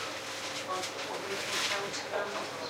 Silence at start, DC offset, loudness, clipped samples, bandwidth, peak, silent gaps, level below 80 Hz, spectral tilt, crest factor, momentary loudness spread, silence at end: 0 s; under 0.1%; -34 LUFS; under 0.1%; 16 kHz; -18 dBFS; none; -74 dBFS; -1.5 dB/octave; 16 dB; 6 LU; 0 s